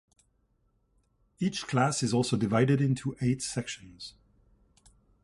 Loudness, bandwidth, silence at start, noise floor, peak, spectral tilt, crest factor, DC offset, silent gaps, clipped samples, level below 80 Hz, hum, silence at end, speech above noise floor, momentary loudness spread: -29 LUFS; 11.5 kHz; 1.4 s; -71 dBFS; -10 dBFS; -5.5 dB/octave; 20 dB; under 0.1%; none; under 0.1%; -60 dBFS; none; 1.15 s; 43 dB; 16 LU